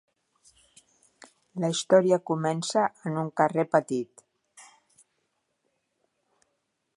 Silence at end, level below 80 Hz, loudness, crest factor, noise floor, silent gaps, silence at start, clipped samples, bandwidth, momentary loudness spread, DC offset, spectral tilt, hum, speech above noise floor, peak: 2.35 s; -78 dBFS; -26 LUFS; 24 dB; -78 dBFS; none; 1.55 s; under 0.1%; 11.5 kHz; 11 LU; under 0.1%; -5 dB/octave; none; 53 dB; -6 dBFS